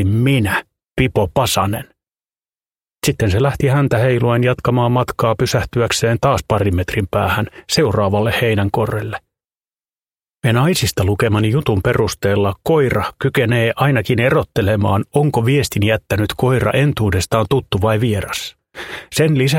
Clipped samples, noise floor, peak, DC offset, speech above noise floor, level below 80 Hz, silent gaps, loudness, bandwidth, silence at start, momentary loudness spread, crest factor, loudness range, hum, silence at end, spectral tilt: under 0.1%; under -90 dBFS; 0 dBFS; under 0.1%; over 75 dB; -38 dBFS; 9.56-9.60 s; -16 LUFS; 16.5 kHz; 0 s; 6 LU; 16 dB; 3 LU; none; 0 s; -5.5 dB/octave